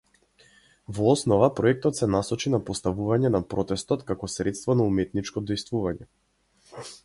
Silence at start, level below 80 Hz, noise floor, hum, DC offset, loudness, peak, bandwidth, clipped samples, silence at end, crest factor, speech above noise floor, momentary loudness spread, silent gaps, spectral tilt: 0.9 s; -50 dBFS; -60 dBFS; none; under 0.1%; -25 LUFS; -4 dBFS; 11.5 kHz; under 0.1%; 0.1 s; 20 dB; 35 dB; 10 LU; none; -6 dB/octave